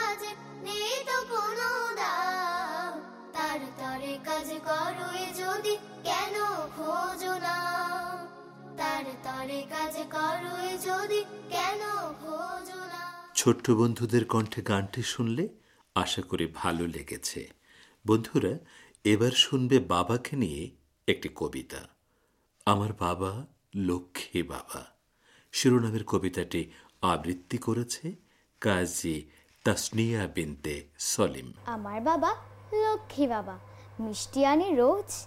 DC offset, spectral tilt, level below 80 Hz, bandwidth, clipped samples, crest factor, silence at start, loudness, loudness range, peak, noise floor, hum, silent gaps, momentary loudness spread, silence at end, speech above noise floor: under 0.1%; -4.5 dB/octave; -58 dBFS; 16.5 kHz; under 0.1%; 24 dB; 0 s; -30 LUFS; 5 LU; -8 dBFS; -71 dBFS; none; none; 13 LU; 0 s; 42 dB